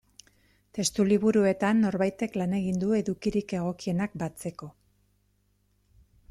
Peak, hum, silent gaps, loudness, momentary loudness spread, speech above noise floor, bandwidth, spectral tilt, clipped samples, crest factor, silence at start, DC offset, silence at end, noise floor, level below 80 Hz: -12 dBFS; 50 Hz at -50 dBFS; none; -27 LUFS; 14 LU; 43 dB; 13.5 kHz; -5.5 dB/octave; under 0.1%; 16 dB; 0.75 s; under 0.1%; 1.6 s; -70 dBFS; -60 dBFS